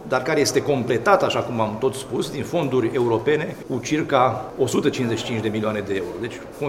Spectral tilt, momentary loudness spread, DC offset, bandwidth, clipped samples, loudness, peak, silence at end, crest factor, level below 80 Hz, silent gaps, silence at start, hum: -5 dB/octave; 8 LU; under 0.1%; 16 kHz; under 0.1%; -22 LUFS; -2 dBFS; 0 s; 20 dB; -54 dBFS; none; 0 s; none